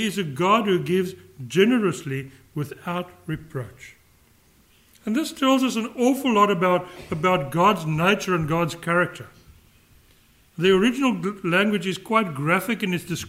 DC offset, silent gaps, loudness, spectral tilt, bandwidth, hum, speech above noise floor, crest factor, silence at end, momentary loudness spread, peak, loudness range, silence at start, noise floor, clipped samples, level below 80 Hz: under 0.1%; none; -22 LUFS; -5.5 dB/octave; 16 kHz; none; 35 dB; 18 dB; 0 s; 13 LU; -6 dBFS; 6 LU; 0 s; -57 dBFS; under 0.1%; -56 dBFS